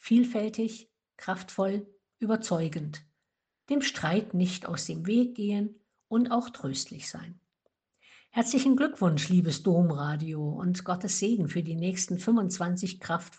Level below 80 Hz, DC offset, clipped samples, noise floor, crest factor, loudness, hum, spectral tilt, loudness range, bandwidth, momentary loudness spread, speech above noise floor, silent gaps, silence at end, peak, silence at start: -70 dBFS; under 0.1%; under 0.1%; -84 dBFS; 18 dB; -29 LUFS; none; -5.5 dB/octave; 5 LU; 9.2 kHz; 11 LU; 56 dB; none; 0.1 s; -12 dBFS; 0.05 s